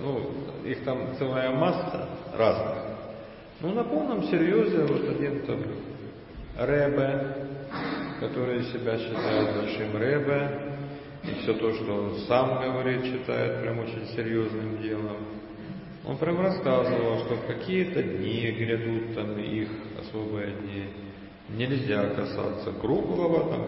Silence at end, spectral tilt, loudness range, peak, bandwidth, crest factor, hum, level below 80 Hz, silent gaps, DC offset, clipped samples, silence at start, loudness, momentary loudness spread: 0 s; -11 dB/octave; 4 LU; -8 dBFS; 5.8 kHz; 20 dB; none; -54 dBFS; none; under 0.1%; under 0.1%; 0 s; -28 LUFS; 13 LU